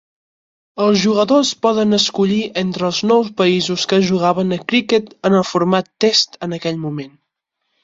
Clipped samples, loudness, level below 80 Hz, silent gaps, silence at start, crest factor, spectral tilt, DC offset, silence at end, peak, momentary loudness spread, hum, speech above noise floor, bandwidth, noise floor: under 0.1%; -16 LUFS; -58 dBFS; none; 0.75 s; 16 dB; -4.5 dB/octave; under 0.1%; 0.75 s; -2 dBFS; 8 LU; none; 58 dB; 7.8 kHz; -73 dBFS